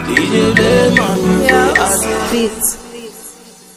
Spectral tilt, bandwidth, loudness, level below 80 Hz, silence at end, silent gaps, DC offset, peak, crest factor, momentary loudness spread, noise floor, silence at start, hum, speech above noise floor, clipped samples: -4 dB/octave; 16 kHz; -12 LUFS; -34 dBFS; 0.25 s; none; under 0.1%; 0 dBFS; 14 dB; 19 LU; -37 dBFS; 0 s; none; 25 dB; under 0.1%